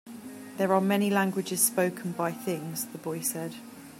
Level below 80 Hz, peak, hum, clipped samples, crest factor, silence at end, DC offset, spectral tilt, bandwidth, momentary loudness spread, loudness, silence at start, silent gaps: -76 dBFS; -8 dBFS; none; under 0.1%; 20 dB; 0 s; under 0.1%; -4 dB/octave; 16 kHz; 16 LU; -28 LUFS; 0.05 s; none